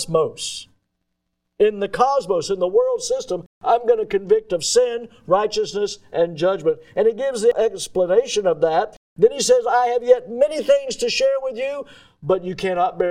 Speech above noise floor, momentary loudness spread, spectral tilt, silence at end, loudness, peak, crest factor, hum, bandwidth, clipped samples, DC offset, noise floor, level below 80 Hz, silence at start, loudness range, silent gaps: 56 dB; 8 LU; -3.5 dB/octave; 0 s; -20 LUFS; -2 dBFS; 18 dB; none; 14 kHz; under 0.1%; under 0.1%; -75 dBFS; -54 dBFS; 0 s; 3 LU; 3.46-3.61 s, 8.97-9.16 s